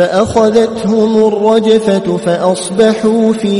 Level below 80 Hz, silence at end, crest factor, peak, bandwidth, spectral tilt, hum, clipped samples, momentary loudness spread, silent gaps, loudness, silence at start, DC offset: -44 dBFS; 0 s; 10 dB; 0 dBFS; 11.5 kHz; -5.5 dB/octave; none; under 0.1%; 4 LU; none; -11 LUFS; 0 s; under 0.1%